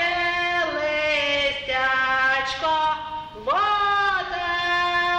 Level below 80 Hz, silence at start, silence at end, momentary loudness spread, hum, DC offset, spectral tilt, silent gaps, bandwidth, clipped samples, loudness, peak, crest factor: -50 dBFS; 0 s; 0 s; 5 LU; none; under 0.1%; -2.5 dB/octave; none; 10 kHz; under 0.1%; -22 LUFS; -10 dBFS; 12 dB